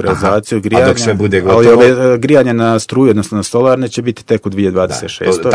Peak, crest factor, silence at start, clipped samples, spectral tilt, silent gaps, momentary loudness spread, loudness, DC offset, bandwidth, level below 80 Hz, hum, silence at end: 0 dBFS; 10 dB; 0 s; 2%; -6 dB/octave; none; 9 LU; -11 LUFS; under 0.1%; 11 kHz; -42 dBFS; none; 0 s